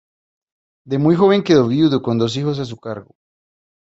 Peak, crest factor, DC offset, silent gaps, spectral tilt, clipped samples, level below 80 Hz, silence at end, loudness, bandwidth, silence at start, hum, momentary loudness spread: -2 dBFS; 16 dB; under 0.1%; none; -7 dB/octave; under 0.1%; -56 dBFS; 0.85 s; -16 LUFS; 8 kHz; 0.85 s; none; 16 LU